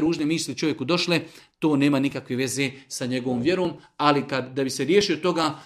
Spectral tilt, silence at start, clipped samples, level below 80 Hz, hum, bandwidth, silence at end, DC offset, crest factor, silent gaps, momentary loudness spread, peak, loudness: -4.5 dB/octave; 0 s; under 0.1%; -60 dBFS; none; 15 kHz; 0 s; under 0.1%; 22 dB; none; 7 LU; -2 dBFS; -24 LUFS